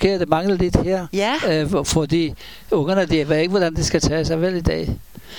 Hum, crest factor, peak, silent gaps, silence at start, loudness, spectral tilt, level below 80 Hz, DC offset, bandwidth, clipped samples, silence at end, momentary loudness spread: none; 18 dB; 0 dBFS; none; 0 s; -19 LUFS; -5.5 dB/octave; -34 dBFS; 0.7%; 19 kHz; under 0.1%; 0 s; 5 LU